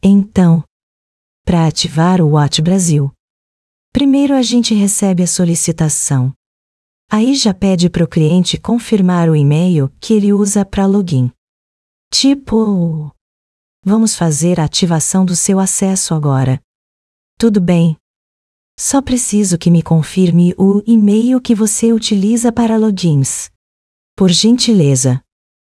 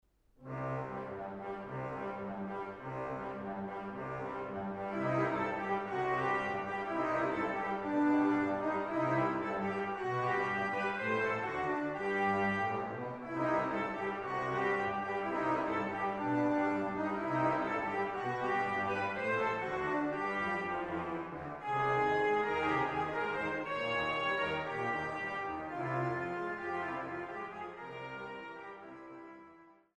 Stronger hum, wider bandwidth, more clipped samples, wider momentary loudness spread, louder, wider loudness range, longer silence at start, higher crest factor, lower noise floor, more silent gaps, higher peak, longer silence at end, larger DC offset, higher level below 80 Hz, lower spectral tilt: neither; first, 12 kHz vs 9.8 kHz; neither; second, 6 LU vs 10 LU; first, -12 LUFS vs -35 LUFS; second, 3 LU vs 8 LU; second, 0.05 s vs 0.4 s; about the same, 12 dB vs 16 dB; first, under -90 dBFS vs -60 dBFS; first, 0.70-1.45 s, 3.20-3.92 s, 6.36-7.08 s, 11.38-12.11 s, 13.21-13.83 s, 16.64-17.37 s, 18.00-18.78 s, 23.55-24.17 s vs none; first, 0 dBFS vs -18 dBFS; first, 0.55 s vs 0.25 s; neither; first, -42 dBFS vs -66 dBFS; second, -5.5 dB/octave vs -7 dB/octave